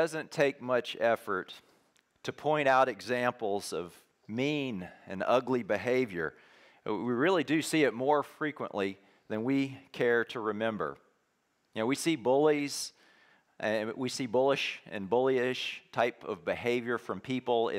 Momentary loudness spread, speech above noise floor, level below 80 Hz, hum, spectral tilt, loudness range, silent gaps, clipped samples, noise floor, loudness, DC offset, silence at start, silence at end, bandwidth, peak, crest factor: 11 LU; 45 dB; -76 dBFS; none; -4.5 dB/octave; 2 LU; none; under 0.1%; -75 dBFS; -31 LUFS; under 0.1%; 0 s; 0 s; 16 kHz; -14 dBFS; 18 dB